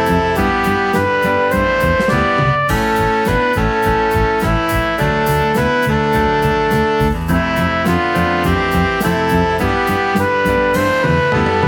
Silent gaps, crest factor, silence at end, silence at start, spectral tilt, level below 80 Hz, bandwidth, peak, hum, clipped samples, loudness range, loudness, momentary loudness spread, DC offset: none; 12 dB; 0 s; 0 s; -6 dB/octave; -28 dBFS; 19 kHz; -2 dBFS; none; under 0.1%; 1 LU; -15 LUFS; 2 LU; under 0.1%